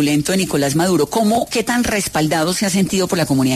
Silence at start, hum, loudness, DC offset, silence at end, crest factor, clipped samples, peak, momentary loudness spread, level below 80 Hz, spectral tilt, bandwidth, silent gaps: 0 s; none; -17 LUFS; under 0.1%; 0 s; 12 dB; under 0.1%; -4 dBFS; 2 LU; -44 dBFS; -4.5 dB/octave; 14 kHz; none